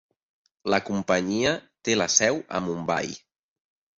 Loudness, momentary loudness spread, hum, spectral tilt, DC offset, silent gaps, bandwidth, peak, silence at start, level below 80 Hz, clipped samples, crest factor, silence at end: -25 LUFS; 11 LU; none; -3 dB/octave; under 0.1%; none; 8 kHz; -4 dBFS; 0.65 s; -60 dBFS; under 0.1%; 24 dB; 0.8 s